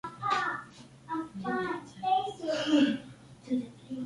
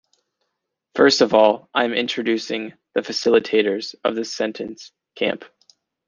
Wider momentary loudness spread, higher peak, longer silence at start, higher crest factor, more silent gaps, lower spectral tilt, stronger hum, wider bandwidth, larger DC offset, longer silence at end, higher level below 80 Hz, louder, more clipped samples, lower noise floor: first, 19 LU vs 14 LU; second, -14 dBFS vs -2 dBFS; second, 0.05 s vs 0.95 s; about the same, 18 dB vs 20 dB; neither; first, -5 dB/octave vs -3.5 dB/octave; neither; first, 11.5 kHz vs 7.6 kHz; neither; second, 0 s vs 0.6 s; about the same, -68 dBFS vs -66 dBFS; second, -32 LUFS vs -20 LUFS; neither; second, -51 dBFS vs -78 dBFS